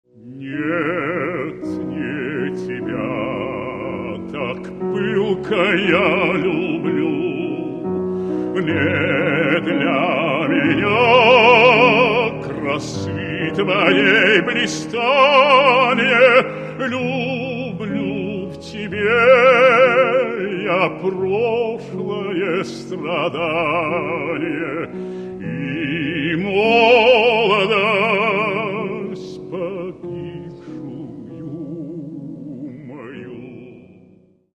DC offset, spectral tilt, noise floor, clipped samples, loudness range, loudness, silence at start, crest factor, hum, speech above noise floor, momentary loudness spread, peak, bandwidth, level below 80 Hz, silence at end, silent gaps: under 0.1%; -5.5 dB/octave; -51 dBFS; under 0.1%; 12 LU; -17 LUFS; 0.25 s; 18 dB; none; 35 dB; 19 LU; 0 dBFS; 9.4 kHz; -52 dBFS; 0.75 s; none